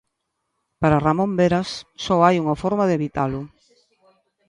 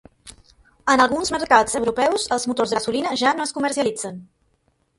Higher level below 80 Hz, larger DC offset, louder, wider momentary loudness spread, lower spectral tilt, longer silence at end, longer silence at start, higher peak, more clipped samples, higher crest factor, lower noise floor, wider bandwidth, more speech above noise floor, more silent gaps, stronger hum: first, -48 dBFS vs -54 dBFS; neither; about the same, -20 LUFS vs -20 LUFS; first, 13 LU vs 9 LU; first, -7 dB/octave vs -2.5 dB/octave; first, 1 s vs 0.75 s; first, 0.8 s vs 0.25 s; about the same, -2 dBFS vs 0 dBFS; neither; about the same, 20 dB vs 22 dB; first, -76 dBFS vs -66 dBFS; about the same, 10.5 kHz vs 11.5 kHz; first, 57 dB vs 46 dB; neither; neither